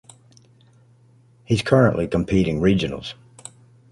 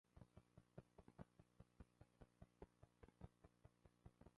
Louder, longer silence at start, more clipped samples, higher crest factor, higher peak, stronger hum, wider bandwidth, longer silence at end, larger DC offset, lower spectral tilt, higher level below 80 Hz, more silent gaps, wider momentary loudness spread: first, -20 LUFS vs -68 LUFS; first, 1.5 s vs 0.05 s; neither; second, 20 dB vs 26 dB; first, -2 dBFS vs -44 dBFS; neither; about the same, 11.5 kHz vs 10.5 kHz; first, 0.8 s vs 0 s; neither; about the same, -7 dB/octave vs -7.5 dB/octave; first, -42 dBFS vs -76 dBFS; neither; first, 24 LU vs 2 LU